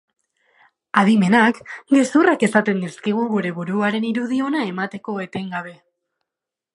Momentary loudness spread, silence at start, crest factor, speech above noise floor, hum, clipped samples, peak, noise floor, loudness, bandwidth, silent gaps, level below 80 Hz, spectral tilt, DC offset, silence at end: 13 LU; 0.95 s; 20 dB; 67 dB; none; under 0.1%; 0 dBFS; -86 dBFS; -19 LUFS; 11.5 kHz; none; -68 dBFS; -6 dB/octave; under 0.1%; 1 s